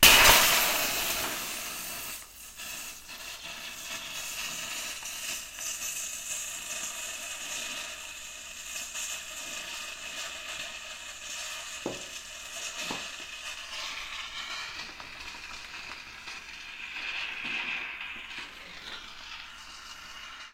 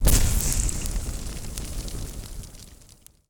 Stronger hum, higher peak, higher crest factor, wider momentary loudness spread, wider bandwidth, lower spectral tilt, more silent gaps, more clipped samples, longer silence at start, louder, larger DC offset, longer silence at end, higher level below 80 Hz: neither; first, 0 dBFS vs -4 dBFS; first, 32 dB vs 22 dB; second, 12 LU vs 21 LU; second, 16 kHz vs over 20 kHz; second, 0 dB/octave vs -3.5 dB/octave; neither; neither; about the same, 0 s vs 0 s; second, -31 LUFS vs -28 LUFS; neither; second, 0 s vs 0.55 s; second, -52 dBFS vs -28 dBFS